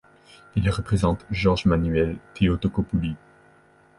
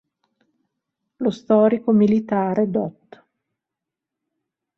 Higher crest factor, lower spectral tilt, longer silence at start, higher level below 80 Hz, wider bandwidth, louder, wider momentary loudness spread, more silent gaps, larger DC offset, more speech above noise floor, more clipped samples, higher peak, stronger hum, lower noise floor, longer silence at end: about the same, 18 dB vs 16 dB; second, -7.5 dB/octave vs -9 dB/octave; second, 0.55 s vs 1.2 s; first, -36 dBFS vs -64 dBFS; first, 11.5 kHz vs 6.4 kHz; second, -24 LUFS vs -19 LUFS; second, 6 LU vs 9 LU; neither; neither; second, 33 dB vs 67 dB; neither; about the same, -6 dBFS vs -6 dBFS; neither; second, -56 dBFS vs -85 dBFS; second, 0.8 s vs 1.85 s